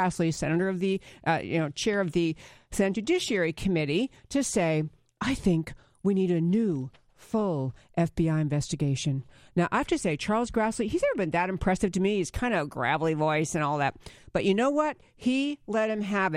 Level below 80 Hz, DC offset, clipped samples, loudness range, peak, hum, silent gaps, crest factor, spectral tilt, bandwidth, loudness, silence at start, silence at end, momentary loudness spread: -50 dBFS; under 0.1%; under 0.1%; 1 LU; -10 dBFS; none; none; 16 dB; -5.5 dB/octave; 14.5 kHz; -28 LUFS; 0 s; 0 s; 6 LU